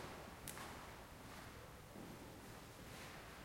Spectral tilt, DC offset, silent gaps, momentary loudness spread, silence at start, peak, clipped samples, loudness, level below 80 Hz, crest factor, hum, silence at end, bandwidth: -4 dB/octave; under 0.1%; none; 5 LU; 0 s; -26 dBFS; under 0.1%; -54 LUFS; -66 dBFS; 28 dB; none; 0 s; 16.5 kHz